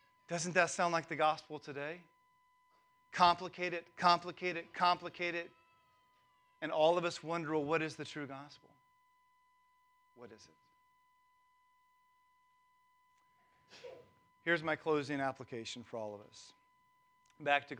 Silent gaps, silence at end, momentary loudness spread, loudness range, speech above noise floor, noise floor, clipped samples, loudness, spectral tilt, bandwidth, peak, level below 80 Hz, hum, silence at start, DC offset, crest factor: none; 0 s; 21 LU; 8 LU; 37 dB; -73 dBFS; under 0.1%; -36 LUFS; -4 dB/octave; 11 kHz; -14 dBFS; -80 dBFS; none; 0.3 s; under 0.1%; 24 dB